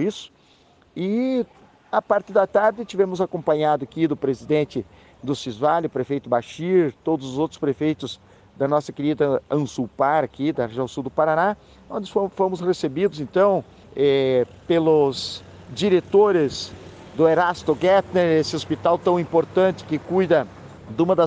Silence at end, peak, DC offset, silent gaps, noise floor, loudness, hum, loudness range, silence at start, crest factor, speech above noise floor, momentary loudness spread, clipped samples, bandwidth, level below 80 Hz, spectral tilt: 0 s; -6 dBFS; under 0.1%; none; -55 dBFS; -22 LUFS; none; 4 LU; 0 s; 16 dB; 35 dB; 13 LU; under 0.1%; 9.4 kHz; -58 dBFS; -6.5 dB/octave